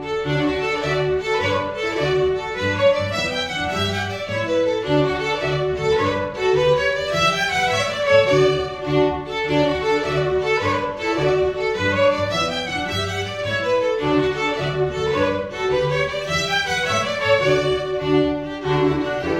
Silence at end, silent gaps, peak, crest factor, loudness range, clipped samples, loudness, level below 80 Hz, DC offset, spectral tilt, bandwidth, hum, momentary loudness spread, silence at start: 0 s; none; -4 dBFS; 16 dB; 3 LU; under 0.1%; -20 LUFS; -44 dBFS; under 0.1%; -5 dB/octave; 14.5 kHz; none; 5 LU; 0 s